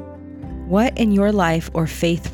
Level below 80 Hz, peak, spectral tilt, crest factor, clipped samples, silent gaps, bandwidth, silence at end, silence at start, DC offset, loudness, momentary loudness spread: -34 dBFS; -6 dBFS; -6.5 dB/octave; 14 dB; under 0.1%; none; 18 kHz; 0 s; 0 s; under 0.1%; -19 LUFS; 18 LU